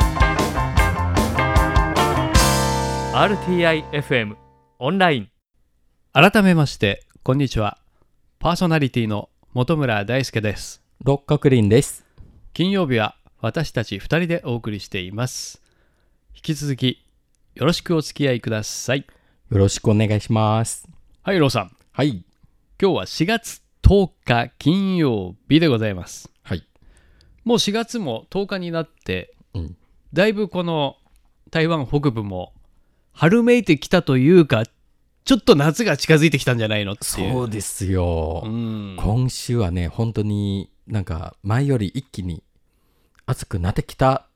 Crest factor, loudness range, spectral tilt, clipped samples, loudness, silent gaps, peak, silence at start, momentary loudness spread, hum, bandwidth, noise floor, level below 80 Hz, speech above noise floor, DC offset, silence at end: 20 dB; 7 LU; -5.5 dB/octave; under 0.1%; -20 LUFS; none; 0 dBFS; 0 s; 14 LU; none; 17 kHz; -63 dBFS; -34 dBFS; 44 dB; under 0.1%; 0.15 s